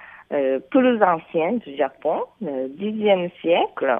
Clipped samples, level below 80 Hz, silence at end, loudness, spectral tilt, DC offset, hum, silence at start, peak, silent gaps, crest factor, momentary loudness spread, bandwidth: under 0.1%; -68 dBFS; 0 s; -22 LUFS; -9 dB/octave; under 0.1%; none; 0 s; -2 dBFS; none; 18 dB; 9 LU; 3.8 kHz